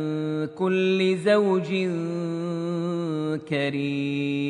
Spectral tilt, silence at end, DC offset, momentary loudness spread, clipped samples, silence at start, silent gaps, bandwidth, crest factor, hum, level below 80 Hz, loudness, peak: -7 dB/octave; 0 s; under 0.1%; 8 LU; under 0.1%; 0 s; none; 10.5 kHz; 14 dB; none; -72 dBFS; -25 LUFS; -10 dBFS